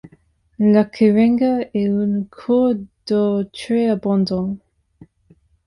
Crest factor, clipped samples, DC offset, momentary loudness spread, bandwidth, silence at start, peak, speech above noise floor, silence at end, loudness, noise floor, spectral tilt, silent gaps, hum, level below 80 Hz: 16 dB; under 0.1%; under 0.1%; 9 LU; 11 kHz; 0.05 s; -4 dBFS; 38 dB; 1.1 s; -18 LUFS; -55 dBFS; -8 dB/octave; none; none; -54 dBFS